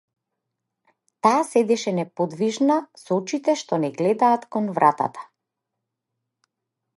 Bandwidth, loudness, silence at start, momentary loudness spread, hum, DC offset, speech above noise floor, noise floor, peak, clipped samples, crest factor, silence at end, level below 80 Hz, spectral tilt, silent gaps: 11.5 kHz; -22 LUFS; 1.25 s; 7 LU; none; under 0.1%; 61 dB; -82 dBFS; -4 dBFS; under 0.1%; 20 dB; 1.75 s; -78 dBFS; -5.5 dB/octave; none